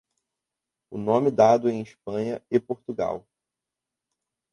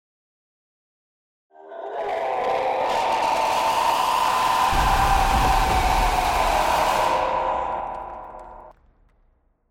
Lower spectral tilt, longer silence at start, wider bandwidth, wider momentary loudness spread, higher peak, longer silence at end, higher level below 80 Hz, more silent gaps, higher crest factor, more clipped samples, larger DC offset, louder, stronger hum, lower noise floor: first, -7 dB/octave vs -3.5 dB/octave; second, 0.9 s vs 1.6 s; second, 11 kHz vs 16.5 kHz; about the same, 14 LU vs 14 LU; about the same, -6 dBFS vs -8 dBFS; first, 1.35 s vs 1 s; second, -64 dBFS vs -32 dBFS; neither; first, 20 dB vs 14 dB; neither; neither; second, -24 LUFS vs -21 LUFS; neither; first, -87 dBFS vs -62 dBFS